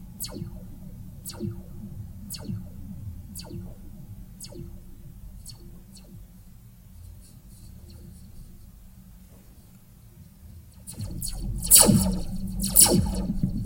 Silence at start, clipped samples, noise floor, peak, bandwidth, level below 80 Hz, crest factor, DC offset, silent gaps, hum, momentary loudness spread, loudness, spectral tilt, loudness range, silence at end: 0 s; under 0.1%; -50 dBFS; 0 dBFS; 16.5 kHz; -40 dBFS; 28 dB; under 0.1%; none; none; 29 LU; -21 LUFS; -3 dB/octave; 28 LU; 0 s